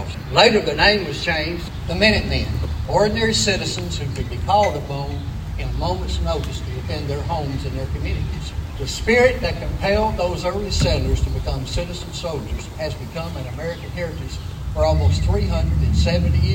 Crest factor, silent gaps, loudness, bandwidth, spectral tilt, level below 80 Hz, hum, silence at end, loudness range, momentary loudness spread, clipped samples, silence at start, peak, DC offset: 20 dB; none; -21 LUFS; 16.5 kHz; -5 dB/octave; -26 dBFS; none; 0 s; 7 LU; 13 LU; under 0.1%; 0 s; 0 dBFS; under 0.1%